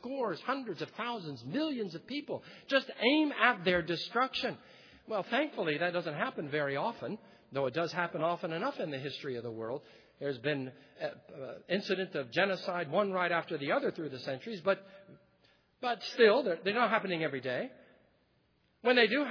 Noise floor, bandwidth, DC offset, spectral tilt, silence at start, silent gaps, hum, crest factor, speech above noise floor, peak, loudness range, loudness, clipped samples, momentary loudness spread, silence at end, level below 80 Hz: -72 dBFS; 5.4 kHz; under 0.1%; -6 dB/octave; 0 s; none; none; 24 dB; 39 dB; -10 dBFS; 5 LU; -33 LUFS; under 0.1%; 14 LU; 0 s; -74 dBFS